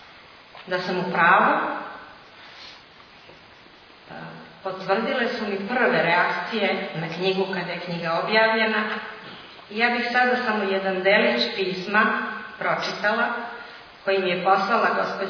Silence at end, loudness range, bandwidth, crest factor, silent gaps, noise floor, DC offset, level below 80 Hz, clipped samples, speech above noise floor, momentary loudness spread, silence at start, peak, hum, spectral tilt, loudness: 0 s; 8 LU; 5.4 kHz; 22 dB; none; -49 dBFS; under 0.1%; -68 dBFS; under 0.1%; 26 dB; 20 LU; 0 s; -2 dBFS; none; -5.5 dB/octave; -22 LUFS